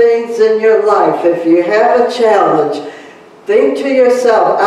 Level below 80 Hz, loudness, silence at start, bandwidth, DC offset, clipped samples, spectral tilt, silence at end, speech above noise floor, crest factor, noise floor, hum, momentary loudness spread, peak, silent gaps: -58 dBFS; -10 LUFS; 0 s; 11.5 kHz; under 0.1%; under 0.1%; -5 dB/octave; 0 s; 26 dB; 10 dB; -36 dBFS; none; 5 LU; 0 dBFS; none